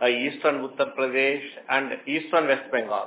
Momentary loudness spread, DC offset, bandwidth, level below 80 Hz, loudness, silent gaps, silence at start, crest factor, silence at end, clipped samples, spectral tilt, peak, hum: 6 LU; under 0.1%; 4 kHz; -88 dBFS; -25 LUFS; none; 0 s; 18 dB; 0 s; under 0.1%; -7.5 dB/octave; -6 dBFS; none